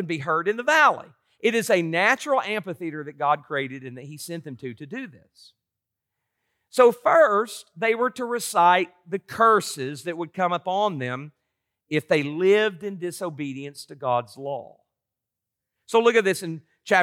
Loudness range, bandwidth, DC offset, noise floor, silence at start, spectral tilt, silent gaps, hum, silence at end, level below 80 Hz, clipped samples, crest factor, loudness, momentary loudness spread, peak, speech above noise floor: 9 LU; 16.5 kHz; under 0.1%; -86 dBFS; 0 s; -4.5 dB/octave; none; none; 0 s; -78 dBFS; under 0.1%; 18 dB; -23 LUFS; 17 LU; -6 dBFS; 62 dB